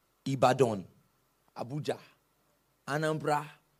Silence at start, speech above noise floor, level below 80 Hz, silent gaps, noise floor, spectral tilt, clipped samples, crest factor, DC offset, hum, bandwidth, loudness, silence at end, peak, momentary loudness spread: 0.25 s; 42 dB; -74 dBFS; none; -72 dBFS; -6 dB/octave; under 0.1%; 22 dB; under 0.1%; none; 15.5 kHz; -31 LUFS; 0.25 s; -10 dBFS; 17 LU